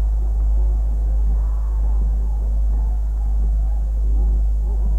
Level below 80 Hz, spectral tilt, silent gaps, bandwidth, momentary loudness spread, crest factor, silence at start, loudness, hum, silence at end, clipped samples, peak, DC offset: -18 dBFS; -9.5 dB/octave; none; 1.4 kHz; 2 LU; 6 dB; 0 s; -22 LUFS; none; 0 s; under 0.1%; -10 dBFS; 1%